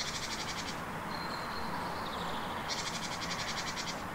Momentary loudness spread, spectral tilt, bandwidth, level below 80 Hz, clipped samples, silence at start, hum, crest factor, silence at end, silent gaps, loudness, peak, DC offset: 3 LU; -2.5 dB/octave; 16 kHz; -56 dBFS; under 0.1%; 0 s; none; 16 dB; 0 s; none; -37 LUFS; -22 dBFS; under 0.1%